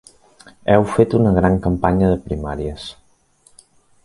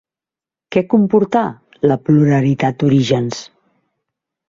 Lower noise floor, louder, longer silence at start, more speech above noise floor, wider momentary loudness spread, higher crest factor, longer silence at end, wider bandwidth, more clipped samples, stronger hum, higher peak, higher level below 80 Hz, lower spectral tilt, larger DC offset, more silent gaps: second, -56 dBFS vs -89 dBFS; about the same, -17 LUFS vs -15 LUFS; about the same, 0.65 s vs 0.7 s; second, 39 dB vs 75 dB; first, 13 LU vs 8 LU; about the same, 18 dB vs 14 dB; about the same, 1.1 s vs 1.05 s; first, 11.5 kHz vs 7.6 kHz; neither; neither; about the same, 0 dBFS vs -2 dBFS; first, -34 dBFS vs -54 dBFS; about the same, -8 dB/octave vs -7.5 dB/octave; neither; neither